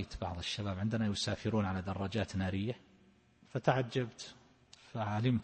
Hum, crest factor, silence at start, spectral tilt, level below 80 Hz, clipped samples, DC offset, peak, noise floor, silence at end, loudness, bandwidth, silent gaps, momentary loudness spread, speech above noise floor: none; 22 dB; 0 s; -6 dB/octave; -58 dBFS; under 0.1%; under 0.1%; -14 dBFS; -66 dBFS; 0 s; -36 LUFS; 8.4 kHz; none; 11 LU; 30 dB